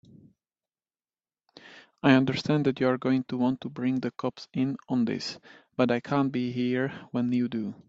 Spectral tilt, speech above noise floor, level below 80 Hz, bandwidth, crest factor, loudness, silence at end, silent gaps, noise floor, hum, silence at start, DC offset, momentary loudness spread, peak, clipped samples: -7 dB/octave; over 63 dB; -68 dBFS; 7.8 kHz; 24 dB; -27 LUFS; 0.15 s; none; under -90 dBFS; none; 1.65 s; under 0.1%; 10 LU; -4 dBFS; under 0.1%